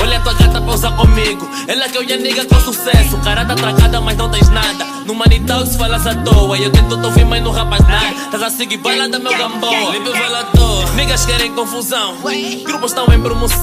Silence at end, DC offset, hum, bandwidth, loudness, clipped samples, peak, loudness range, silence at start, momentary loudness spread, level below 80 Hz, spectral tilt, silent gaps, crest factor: 0 s; under 0.1%; none; 16 kHz; -13 LUFS; under 0.1%; 0 dBFS; 2 LU; 0 s; 6 LU; -16 dBFS; -4.5 dB/octave; none; 12 dB